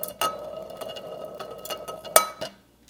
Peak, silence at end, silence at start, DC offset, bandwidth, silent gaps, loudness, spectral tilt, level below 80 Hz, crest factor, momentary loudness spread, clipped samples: 0 dBFS; 0.35 s; 0 s; under 0.1%; 19 kHz; none; -27 LUFS; -0.5 dB/octave; -62 dBFS; 30 dB; 17 LU; under 0.1%